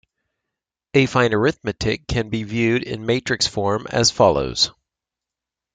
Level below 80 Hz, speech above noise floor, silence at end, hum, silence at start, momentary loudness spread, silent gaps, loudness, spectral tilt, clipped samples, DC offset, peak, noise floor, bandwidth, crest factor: -44 dBFS; 67 dB; 1.05 s; none; 0.95 s; 7 LU; none; -20 LUFS; -4 dB/octave; under 0.1%; under 0.1%; -2 dBFS; -87 dBFS; 9.6 kHz; 20 dB